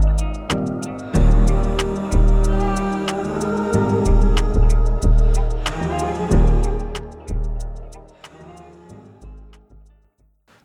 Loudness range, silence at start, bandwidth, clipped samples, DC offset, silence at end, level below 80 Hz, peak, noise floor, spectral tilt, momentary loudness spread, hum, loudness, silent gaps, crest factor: 15 LU; 0 s; 10.5 kHz; under 0.1%; under 0.1%; 1.2 s; -20 dBFS; -6 dBFS; -59 dBFS; -6.5 dB/octave; 13 LU; none; -20 LUFS; none; 12 dB